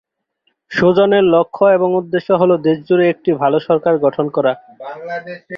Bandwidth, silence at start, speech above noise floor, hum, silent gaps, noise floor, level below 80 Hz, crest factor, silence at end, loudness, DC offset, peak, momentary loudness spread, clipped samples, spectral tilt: 6.4 kHz; 0.7 s; 52 dB; none; none; -66 dBFS; -56 dBFS; 14 dB; 0 s; -14 LUFS; under 0.1%; -2 dBFS; 14 LU; under 0.1%; -8 dB/octave